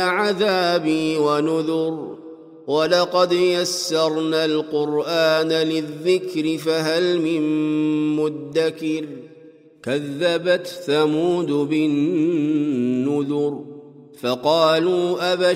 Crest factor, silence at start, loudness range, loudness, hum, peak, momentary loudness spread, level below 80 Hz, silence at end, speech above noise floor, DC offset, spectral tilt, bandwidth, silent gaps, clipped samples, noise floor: 16 dB; 0 s; 3 LU; -20 LUFS; none; -4 dBFS; 8 LU; -70 dBFS; 0 s; 27 dB; under 0.1%; -5 dB/octave; 15.5 kHz; none; under 0.1%; -47 dBFS